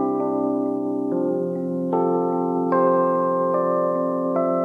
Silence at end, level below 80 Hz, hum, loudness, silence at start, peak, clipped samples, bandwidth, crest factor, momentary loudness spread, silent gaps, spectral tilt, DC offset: 0 s; -70 dBFS; none; -22 LUFS; 0 s; -8 dBFS; under 0.1%; 2.8 kHz; 14 dB; 5 LU; none; -10.5 dB/octave; under 0.1%